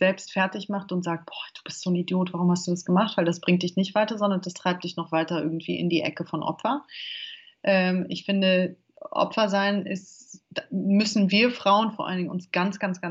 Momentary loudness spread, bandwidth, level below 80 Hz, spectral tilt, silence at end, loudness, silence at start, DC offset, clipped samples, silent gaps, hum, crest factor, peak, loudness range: 12 LU; 8 kHz; -76 dBFS; -5.5 dB/octave; 0 s; -25 LUFS; 0 s; under 0.1%; under 0.1%; none; none; 16 dB; -10 dBFS; 3 LU